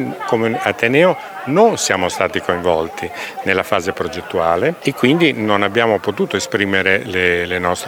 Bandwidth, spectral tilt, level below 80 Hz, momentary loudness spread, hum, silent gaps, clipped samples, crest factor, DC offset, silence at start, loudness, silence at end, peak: 20 kHz; -4.5 dB/octave; -50 dBFS; 7 LU; none; none; under 0.1%; 16 dB; under 0.1%; 0 s; -16 LUFS; 0 s; 0 dBFS